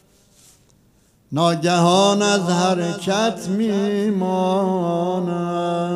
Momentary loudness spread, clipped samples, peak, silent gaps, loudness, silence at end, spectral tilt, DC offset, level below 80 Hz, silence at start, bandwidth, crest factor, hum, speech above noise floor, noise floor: 7 LU; under 0.1%; -4 dBFS; none; -19 LUFS; 0 s; -5 dB/octave; under 0.1%; -62 dBFS; 1.3 s; 13 kHz; 16 dB; none; 38 dB; -57 dBFS